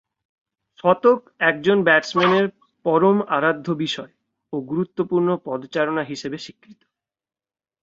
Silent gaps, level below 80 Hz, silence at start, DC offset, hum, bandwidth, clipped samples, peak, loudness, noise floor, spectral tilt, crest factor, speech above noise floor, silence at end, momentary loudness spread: none; -66 dBFS; 0.85 s; under 0.1%; none; 7.8 kHz; under 0.1%; -2 dBFS; -20 LUFS; under -90 dBFS; -6 dB/octave; 20 dB; over 70 dB; 1.1 s; 13 LU